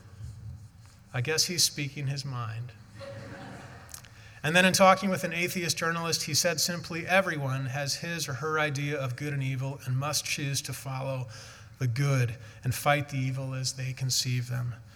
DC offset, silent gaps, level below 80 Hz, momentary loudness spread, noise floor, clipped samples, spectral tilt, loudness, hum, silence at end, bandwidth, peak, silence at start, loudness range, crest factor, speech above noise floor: under 0.1%; none; -62 dBFS; 20 LU; -52 dBFS; under 0.1%; -3.5 dB/octave; -28 LUFS; none; 0 s; 18.5 kHz; -6 dBFS; 0.05 s; 6 LU; 24 dB; 23 dB